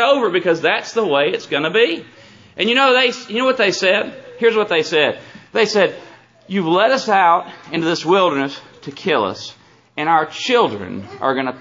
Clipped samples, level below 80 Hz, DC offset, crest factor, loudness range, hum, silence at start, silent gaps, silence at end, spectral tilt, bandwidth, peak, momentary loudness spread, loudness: under 0.1%; -68 dBFS; under 0.1%; 16 dB; 3 LU; none; 0 s; none; 0 s; -4 dB/octave; 7.6 kHz; -2 dBFS; 14 LU; -16 LUFS